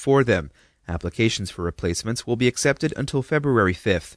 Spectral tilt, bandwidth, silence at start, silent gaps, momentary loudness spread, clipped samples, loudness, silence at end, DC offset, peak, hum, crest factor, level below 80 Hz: -5 dB/octave; 11 kHz; 0 s; none; 10 LU; under 0.1%; -23 LUFS; 0.05 s; under 0.1%; -6 dBFS; none; 18 dB; -44 dBFS